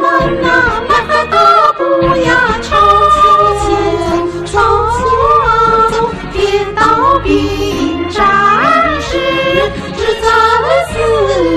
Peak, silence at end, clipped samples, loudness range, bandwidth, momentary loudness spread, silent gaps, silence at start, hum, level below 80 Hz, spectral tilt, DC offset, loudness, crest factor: 0 dBFS; 0 s; under 0.1%; 2 LU; 14 kHz; 8 LU; none; 0 s; none; -28 dBFS; -5 dB/octave; under 0.1%; -10 LUFS; 10 dB